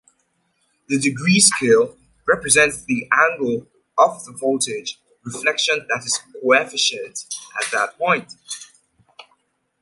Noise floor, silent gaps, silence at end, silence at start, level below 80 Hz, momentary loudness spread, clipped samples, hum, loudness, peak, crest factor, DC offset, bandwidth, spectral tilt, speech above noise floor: -67 dBFS; none; 0.6 s; 0.9 s; -58 dBFS; 16 LU; under 0.1%; none; -18 LUFS; 0 dBFS; 20 dB; under 0.1%; 11.5 kHz; -2.5 dB/octave; 48 dB